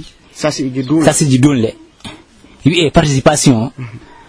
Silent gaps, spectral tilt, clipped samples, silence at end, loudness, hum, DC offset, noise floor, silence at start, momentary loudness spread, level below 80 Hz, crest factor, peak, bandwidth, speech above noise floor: none; -5 dB/octave; 0.4%; 0.3 s; -12 LUFS; none; under 0.1%; -41 dBFS; 0 s; 21 LU; -36 dBFS; 14 dB; 0 dBFS; 11 kHz; 29 dB